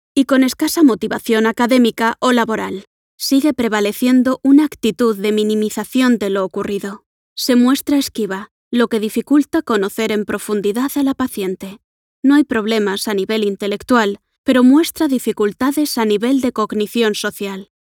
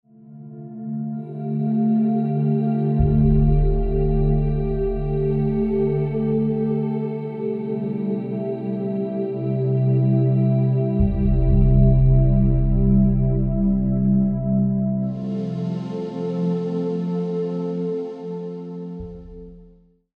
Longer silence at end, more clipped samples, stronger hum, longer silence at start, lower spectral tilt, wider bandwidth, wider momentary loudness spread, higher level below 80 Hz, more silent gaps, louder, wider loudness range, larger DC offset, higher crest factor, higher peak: second, 0.35 s vs 0.55 s; neither; neither; about the same, 0.15 s vs 0.25 s; second, -4.5 dB/octave vs -12 dB/octave; first, 18.5 kHz vs 4.2 kHz; about the same, 10 LU vs 12 LU; second, -56 dBFS vs -26 dBFS; first, 2.87-3.18 s, 7.06-7.36 s, 8.51-8.71 s, 11.84-12.23 s, 14.38-14.44 s vs none; first, -16 LUFS vs -21 LUFS; second, 3 LU vs 7 LU; neither; about the same, 14 dB vs 16 dB; about the same, -2 dBFS vs -4 dBFS